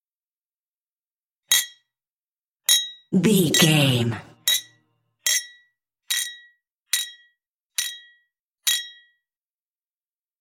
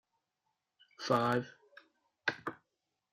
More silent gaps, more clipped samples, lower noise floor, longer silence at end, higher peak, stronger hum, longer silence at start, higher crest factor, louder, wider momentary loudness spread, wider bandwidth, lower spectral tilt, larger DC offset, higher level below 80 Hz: first, 2.10-2.17 s, 2.24-2.42 s, 2.48-2.60 s, 7.47-7.70 s, 8.41-8.55 s vs none; neither; first, under -90 dBFS vs -86 dBFS; first, 1.5 s vs 0.6 s; first, -2 dBFS vs -18 dBFS; neither; first, 1.5 s vs 1 s; about the same, 24 dB vs 22 dB; first, -21 LUFS vs -35 LUFS; about the same, 15 LU vs 15 LU; about the same, 17 kHz vs 15.5 kHz; second, -3 dB/octave vs -5.5 dB/octave; neither; first, -68 dBFS vs -78 dBFS